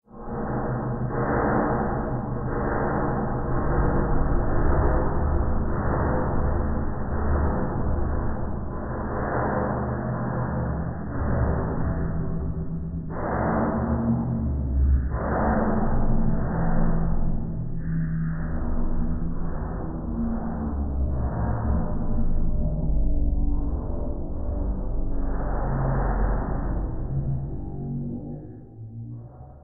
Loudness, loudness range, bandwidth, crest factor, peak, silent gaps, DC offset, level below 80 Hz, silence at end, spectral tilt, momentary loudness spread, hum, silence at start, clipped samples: -27 LUFS; 4 LU; 2.2 kHz; 14 dB; -10 dBFS; none; under 0.1%; -26 dBFS; 0.05 s; -6.5 dB/octave; 8 LU; none; 0.1 s; under 0.1%